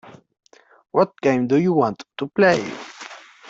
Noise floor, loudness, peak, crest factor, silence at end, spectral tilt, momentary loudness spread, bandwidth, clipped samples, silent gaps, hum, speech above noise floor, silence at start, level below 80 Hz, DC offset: -40 dBFS; -20 LUFS; -4 dBFS; 18 dB; 0.3 s; -6.5 dB/octave; 18 LU; 8 kHz; under 0.1%; none; none; 22 dB; 0.05 s; -62 dBFS; under 0.1%